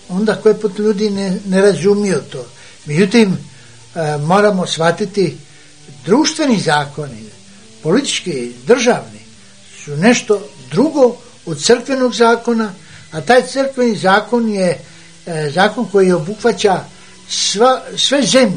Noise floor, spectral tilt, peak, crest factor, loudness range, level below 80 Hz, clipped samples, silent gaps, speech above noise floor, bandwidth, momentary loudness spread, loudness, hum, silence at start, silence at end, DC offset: -42 dBFS; -4.5 dB/octave; 0 dBFS; 14 dB; 3 LU; -56 dBFS; under 0.1%; none; 28 dB; 10 kHz; 14 LU; -14 LUFS; none; 0.1 s; 0 s; 0.6%